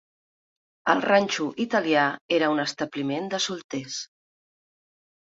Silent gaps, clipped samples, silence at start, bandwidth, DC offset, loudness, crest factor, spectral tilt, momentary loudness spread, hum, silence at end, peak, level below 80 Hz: 2.21-2.29 s, 3.64-3.69 s; under 0.1%; 0.85 s; 8 kHz; under 0.1%; -25 LUFS; 22 dB; -3.5 dB/octave; 11 LU; none; 1.35 s; -4 dBFS; -72 dBFS